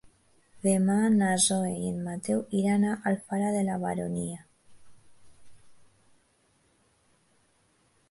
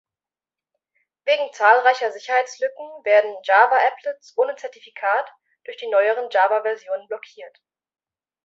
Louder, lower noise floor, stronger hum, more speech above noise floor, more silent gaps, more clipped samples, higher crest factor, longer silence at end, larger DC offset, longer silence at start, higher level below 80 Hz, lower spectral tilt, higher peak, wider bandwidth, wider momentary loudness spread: second, -27 LUFS vs -20 LUFS; second, -68 dBFS vs under -90 dBFS; neither; second, 41 dB vs over 70 dB; neither; neither; about the same, 20 dB vs 20 dB; first, 2.35 s vs 0.95 s; neither; second, 0.05 s vs 1.25 s; first, -64 dBFS vs -84 dBFS; first, -5 dB/octave vs 0 dB/octave; second, -10 dBFS vs -2 dBFS; first, 11.5 kHz vs 7.8 kHz; second, 10 LU vs 18 LU